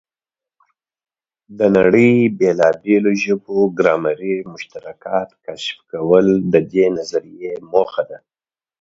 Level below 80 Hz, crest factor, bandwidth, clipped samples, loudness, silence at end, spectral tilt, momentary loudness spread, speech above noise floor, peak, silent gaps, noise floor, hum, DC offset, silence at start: -56 dBFS; 18 dB; 7.8 kHz; under 0.1%; -16 LUFS; 0.65 s; -6.5 dB/octave; 16 LU; over 74 dB; 0 dBFS; none; under -90 dBFS; none; under 0.1%; 1.5 s